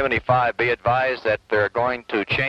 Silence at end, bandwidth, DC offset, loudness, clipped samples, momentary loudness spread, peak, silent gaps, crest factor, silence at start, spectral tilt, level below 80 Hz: 0 s; 8.8 kHz; under 0.1%; -21 LUFS; under 0.1%; 5 LU; -6 dBFS; none; 14 dB; 0 s; -7 dB/octave; -48 dBFS